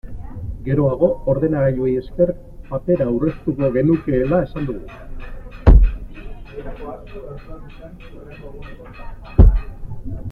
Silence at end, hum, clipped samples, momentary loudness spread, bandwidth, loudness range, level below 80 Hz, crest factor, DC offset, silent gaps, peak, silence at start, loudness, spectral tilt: 0 s; none; under 0.1%; 23 LU; 4.4 kHz; 5 LU; -22 dBFS; 18 dB; under 0.1%; none; -2 dBFS; 0.05 s; -18 LUFS; -11 dB/octave